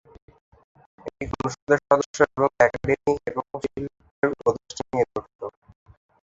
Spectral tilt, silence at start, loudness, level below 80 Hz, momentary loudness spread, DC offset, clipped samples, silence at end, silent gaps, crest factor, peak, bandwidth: -5.5 dB/octave; 1.05 s; -24 LUFS; -50 dBFS; 17 LU; under 0.1%; under 0.1%; 0.8 s; 1.62-1.67 s, 2.06-2.14 s, 4.11-4.22 s, 5.35-5.39 s; 24 dB; -2 dBFS; 8 kHz